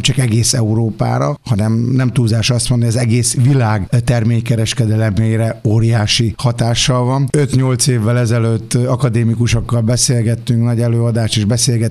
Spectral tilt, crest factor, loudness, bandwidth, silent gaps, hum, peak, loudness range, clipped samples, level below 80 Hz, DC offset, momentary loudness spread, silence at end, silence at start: -5 dB/octave; 14 dB; -14 LUFS; 13 kHz; none; none; 0 dBFS; 1 LU; under 0.1%; -36 dBFS; under 0.1%; 3 LU; 0 s; 0 s